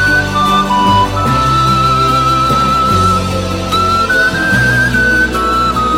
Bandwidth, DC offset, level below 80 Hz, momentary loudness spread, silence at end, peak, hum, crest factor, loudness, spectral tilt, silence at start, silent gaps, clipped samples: 16.5 kHz; under 0.1%; -26 dBFS; 2 LU; 0 s; 0 dBFS; none; 10 dB; -11 LUFS; -4.5 dB/octave; 0 s; none; under 0.1%